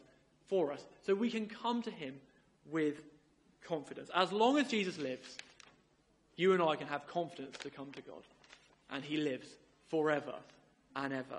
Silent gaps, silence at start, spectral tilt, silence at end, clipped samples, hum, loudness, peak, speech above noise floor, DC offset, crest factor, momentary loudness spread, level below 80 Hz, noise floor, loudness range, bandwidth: none; 0.5 s; -5 dB/octave; 0 s; under 0.1%; none; -37 LUFS; -14 dBFS; 35 dB; under 0.1%; 24 dB; 20 LU; -80 dBFS; -72 dBFS; 6 LU; 11 kHz